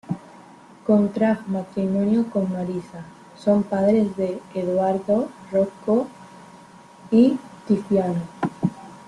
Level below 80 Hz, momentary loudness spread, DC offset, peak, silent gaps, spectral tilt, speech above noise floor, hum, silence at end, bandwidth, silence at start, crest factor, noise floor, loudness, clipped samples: -62 dBFS; 12 LU; under 0.1%; -6 dBFS; none; -8.5 dB/octave; 25 dB; none; 0.05 s; 10.5 kHz; 0.1 s; 18 dB; -46 dBFS; -22 LUFS; under 0.1%